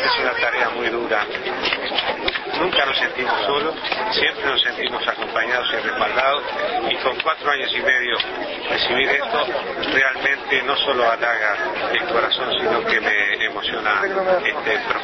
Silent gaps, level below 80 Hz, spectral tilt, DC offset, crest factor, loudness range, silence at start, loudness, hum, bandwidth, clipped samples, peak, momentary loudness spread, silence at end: none; -52 dBFS; -3.5 dB/octave; under 0.1%; 18 dB; 1 LU; 0 s; -19 LUFS; none; 6.4 kHz; under 0.1%; -2 dBFS; 5 LU; 0 s